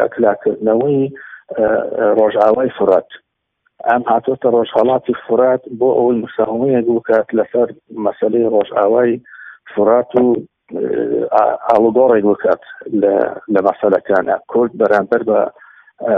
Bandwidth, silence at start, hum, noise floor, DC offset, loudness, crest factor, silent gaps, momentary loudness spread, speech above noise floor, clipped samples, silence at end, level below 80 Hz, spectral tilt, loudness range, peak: 5.2 kHz; 0 s; none; -65 dBFS; under 0.1%; -15 LUFS; 14 dB; none; 8 LU; 51 dB; under 0.1%; 0 s; -56 dBFS; -9 dB/octave; 2 LU; 0 dBFS